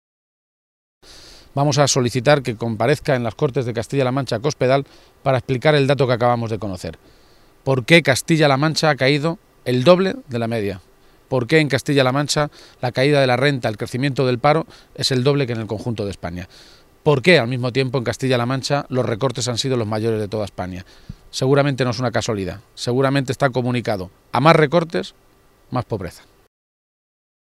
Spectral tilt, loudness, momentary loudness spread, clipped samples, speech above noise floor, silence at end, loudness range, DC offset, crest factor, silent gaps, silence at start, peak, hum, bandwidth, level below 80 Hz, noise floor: -5.5 dB/octave; -19 LUFS; 13 LU; under 0.1%; 25 dB; 1.3 s; 4 LU; under 0.1%; 20 dB; none; 1.15 s; 0 dBFS; none; 14.5 kHz; -50 dBFS; -43 dBFS